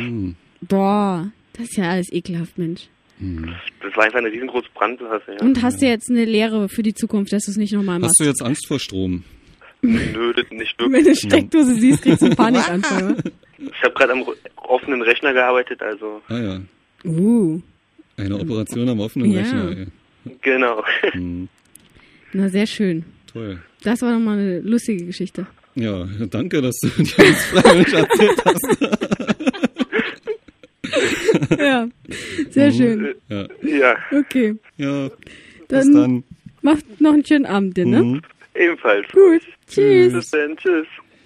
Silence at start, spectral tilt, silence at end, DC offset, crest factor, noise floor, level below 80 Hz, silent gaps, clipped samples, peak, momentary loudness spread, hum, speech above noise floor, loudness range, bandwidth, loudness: 0 s; -5 dB/octave; 0.25 s; under 0.1%; 18 dB; -50 dBFS; -50 dBFS; none; under 0.1%; 0 dBFS; 16 LU; none; 33 dB; 8 LU; 15 kHz; -17 LUFS